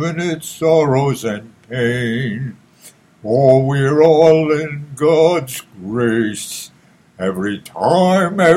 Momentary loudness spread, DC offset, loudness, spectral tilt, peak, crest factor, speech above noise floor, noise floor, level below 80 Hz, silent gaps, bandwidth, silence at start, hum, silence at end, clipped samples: 16 LU; under 0.1%; -15 LUFS; -6 dB/octave; 0 dBFS; 16 dB; 31 dB; -46 dBFS; -54 dBFS; none; 16 kHz; 0 s; none; 0 s; under 0.1%